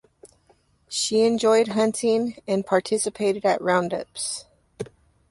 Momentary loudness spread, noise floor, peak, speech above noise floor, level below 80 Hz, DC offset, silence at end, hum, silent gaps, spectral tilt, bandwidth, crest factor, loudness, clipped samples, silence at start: 15 LU; -62 dBFS; -6 dBFS; 39 dB; -64 dBFS; under 0.1%; 0.45 s; none; none; -3.5 dB/octave; 11.5 kHz; 18 dB; -23 LUFS; under 0.1%; 0.25 s